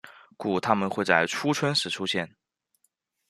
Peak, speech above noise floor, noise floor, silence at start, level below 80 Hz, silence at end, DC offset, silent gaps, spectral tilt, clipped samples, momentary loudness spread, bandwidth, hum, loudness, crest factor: -4 dBFS; 48 dB; -74 dBFS; 0.05 s; -70 dBFS; 1 s; under 0.1%; none; -4 dB/octave; under 0.1%; 8 LU; 14 kHz; none; -26 LUFS; 24 dB